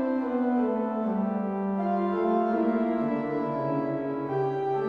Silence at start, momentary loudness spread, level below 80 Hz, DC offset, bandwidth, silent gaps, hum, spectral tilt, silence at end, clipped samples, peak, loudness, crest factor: 0 s; 4 LU; -64 dBFS; under 0.1%; 5.6 kHz; none; none; -10 dB/octave; 0 s; under 0.1%; -14 dBFS; -28 LUFS; 12 dB